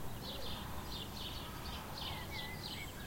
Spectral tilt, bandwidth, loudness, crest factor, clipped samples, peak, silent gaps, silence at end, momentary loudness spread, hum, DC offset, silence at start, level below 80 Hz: -4 dB/octave; 16.5 kHz; -44 LUFS; 14 dB; under 0.1%; -30 dBFS; none; 0 s; 2 LU; none; under 0.1%; 0 s; -52 dBFS